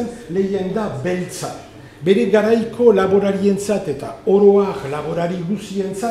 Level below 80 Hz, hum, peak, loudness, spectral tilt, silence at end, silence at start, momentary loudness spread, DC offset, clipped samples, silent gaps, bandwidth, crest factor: -50 dBFS; none; 0 dBFS; -18 LUFS; -6.5 dB/octave; 0 s; 0 s; 11 LU; under 0.1%; under 0.1%; none; 13.5 kHz; 16 dB